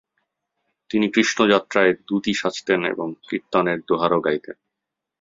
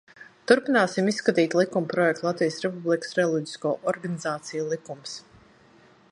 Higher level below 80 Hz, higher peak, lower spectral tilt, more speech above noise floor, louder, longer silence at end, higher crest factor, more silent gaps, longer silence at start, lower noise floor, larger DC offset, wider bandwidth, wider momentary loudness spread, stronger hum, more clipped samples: first, -62 dBFS vs -72 dBFS; about the same, -2 dBFS vs -4 dBFS; about the same, -4.5 dB/octave vs -5 dB/octave; first, 63 dB vs 31 dB; first, -21 LUFS vs -25 LUFS; second, 0.7 s vs 0.9 s; about the same, 20 dB vs 22 dB; neither; first, 0.9 s vs 0.2 s; first, -84 dBFS vs -56 dBFS; neither; second, 7.8 kHz vs 11 kHz; about the same, 11 LU vs 11 LU; neither; neither